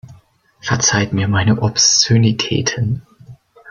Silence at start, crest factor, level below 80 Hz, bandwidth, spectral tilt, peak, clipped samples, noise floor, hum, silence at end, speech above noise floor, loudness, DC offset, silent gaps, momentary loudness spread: 0.05 s; 16 dB; -46 dBFS; 7.4 kHz; -3.5 dB/octave; 0 dBFS; under 0.1%; -50 dBFS; none; 0 s; 35 dB; -14 LUFS; under 0.1%; none; 11 LU